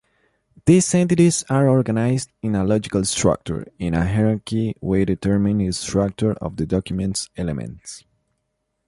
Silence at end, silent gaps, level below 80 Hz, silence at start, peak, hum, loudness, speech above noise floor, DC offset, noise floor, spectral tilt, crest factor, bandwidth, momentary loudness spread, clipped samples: 0.9 s; none; -42 dBFS; 0.65 s; -4 dBFS; none; -20 LUFS; 55 dB; under 0.1%; -74 dBFS; -6 dB/octave; 16 dB; 11.5 kHz; 11 LU; under 0.1%